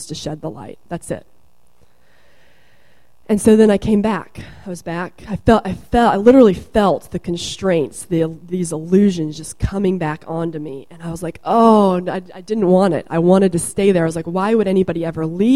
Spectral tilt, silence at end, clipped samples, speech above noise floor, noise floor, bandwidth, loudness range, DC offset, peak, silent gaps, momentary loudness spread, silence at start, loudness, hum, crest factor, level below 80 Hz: -6.5 dB/octave; 0 s; under 0.1%; 41 dB; -57 dBFS; 13.5 kHz; 5 LU; 0.7%; 0 dBFS; none; 18 LU; 0 s; -16 LUFS; none; 16 dB; -40 dBFS